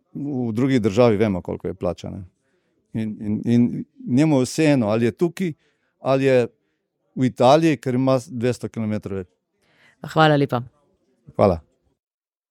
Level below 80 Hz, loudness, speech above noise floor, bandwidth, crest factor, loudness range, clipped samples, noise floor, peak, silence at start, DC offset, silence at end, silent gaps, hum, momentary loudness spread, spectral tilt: -54 dBFS; -20 LUFS; 52 dB; 14 kHz; 20 dB; 3 LU; under 0.1%; -72 dBFS; -2 dBFS; 0.15 s; under 0.1%; 0.9 s; none; none; 15 LU; -7 dB/octave